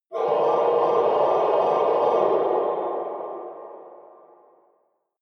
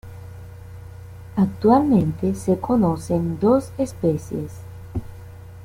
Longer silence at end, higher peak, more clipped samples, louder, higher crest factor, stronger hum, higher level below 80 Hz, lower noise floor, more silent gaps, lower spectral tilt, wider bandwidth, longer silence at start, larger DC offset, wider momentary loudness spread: first, 1.2 s vs 0 s; second, -8 dBFS vs -4 dBFS; neither; about the same, -22 LUFS vs -21 LUFS; about the same, 14 dB vs 18 dB; neither; second, -72 dBFS vs -46 dBFS; first, -68 dBFS vs -39 dBFS; neither; second, -6.5 dB/octave vs -8.5 dB/octave; second, 6.2 kHz vs 16 kHz; about the same, 0.1 s vs 0.05 s; neither; second, 15 LU vs 23 LU